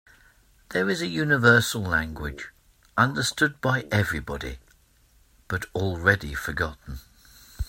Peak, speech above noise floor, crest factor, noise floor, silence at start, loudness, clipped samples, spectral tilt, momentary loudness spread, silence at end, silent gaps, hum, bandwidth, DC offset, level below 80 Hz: -2 dBFS; 35 dB; 24 dB; -60 dBFS; 0.7 s; -24 LUFS; under 0.1%; -4.5 dB/octave; 18 LU; 0 s; none; none; 16.5 kHz; under 0.1%; -44 dBFS